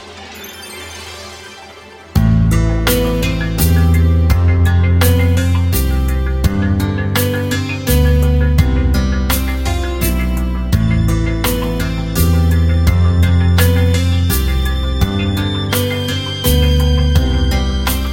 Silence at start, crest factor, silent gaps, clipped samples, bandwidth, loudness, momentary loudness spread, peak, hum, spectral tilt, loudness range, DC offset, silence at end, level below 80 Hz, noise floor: 0 s; 14 dB; none; under 0.1%; 17 kHz; -14 LUFS; 7 LU; 0 dBFS; none; -5.5 dB/octave; 3 LU; under 0.1%; 0 s; -18 dBFS; -36 dBFS